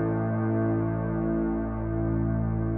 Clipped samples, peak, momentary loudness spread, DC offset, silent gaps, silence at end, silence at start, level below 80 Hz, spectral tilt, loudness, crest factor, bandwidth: under 0.1%; -16 dBFS; 3 LU; under 0.1%; none; 0 s; 0 s; -38 dBFS; -12 dB/octave; -28 LUFS; 10 dB; 2.8 kHz